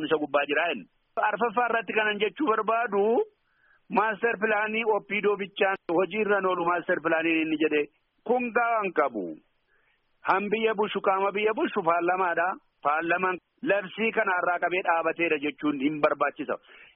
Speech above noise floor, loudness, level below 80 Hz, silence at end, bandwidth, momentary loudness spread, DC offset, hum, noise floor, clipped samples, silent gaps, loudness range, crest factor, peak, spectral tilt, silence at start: 42 dB; -26 LUFS; -74 dBFS; 0.1 s; 5 kHz; 5 LU; under 0.1%; none; -68 dBFS; under 0.1%; none; 2 LU; 18 dB; -8 dBFS; -2.5 dB/octave; 0 s